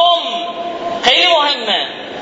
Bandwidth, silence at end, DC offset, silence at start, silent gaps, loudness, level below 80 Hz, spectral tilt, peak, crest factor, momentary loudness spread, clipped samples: 8 kHz; 0 s; under 0.1%; 0 s; none; -14 LUFS; -56 dBFS; -1.5 dB/octave; 0 dBFS; 14 dB; 13 LU; under 0.1%